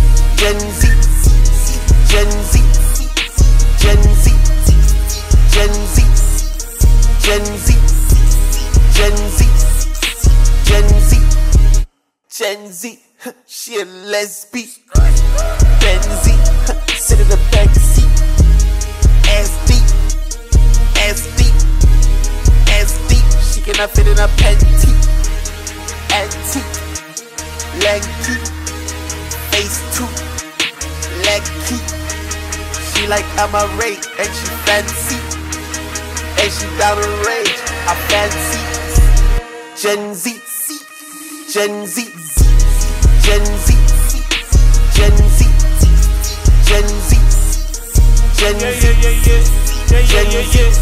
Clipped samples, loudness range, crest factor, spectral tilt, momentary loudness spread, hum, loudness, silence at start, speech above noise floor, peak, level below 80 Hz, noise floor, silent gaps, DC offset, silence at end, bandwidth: under 0.1%; 6 LU; 10 dB; -4 dB/octave; 11 LU; none; -14 LUFS; 0 s; 29 dB; 0 dBFS; -10 dBFS; -40 dBFS; none; under 0.1%; 0 s; 15.5 kHz